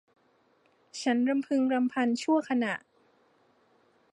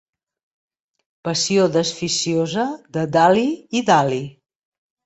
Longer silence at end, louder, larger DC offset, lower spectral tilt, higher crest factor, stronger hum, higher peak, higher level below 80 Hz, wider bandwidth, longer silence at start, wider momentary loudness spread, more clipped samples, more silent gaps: first, 1.35 s vs 0.75 s; second, -28 LUFS vs -19 LUFS; neither; about the same, -4.5 dB/octave vs -4 dB/octave; about the same, 16 dB vs 20 dB; neither; second, -14 dBFS vs -2 dBFS; second, -84 dBFS vs -62 dBFS; first, 11 kHz vs 8.2 kHz; second, 0.95 s vs 1.25 s; second, 7 LU vs 10 LU; neither; neither